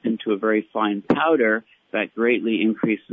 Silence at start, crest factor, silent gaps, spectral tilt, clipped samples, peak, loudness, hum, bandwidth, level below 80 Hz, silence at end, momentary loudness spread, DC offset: 0.05 s; 14 dB; none; -8.5 dB/octave; under 0.1%; -8 dBFS; -21 LUFS; none; 4.8 kHz; -62 dBFS; 0.15 s; 8 LU; under 0.1%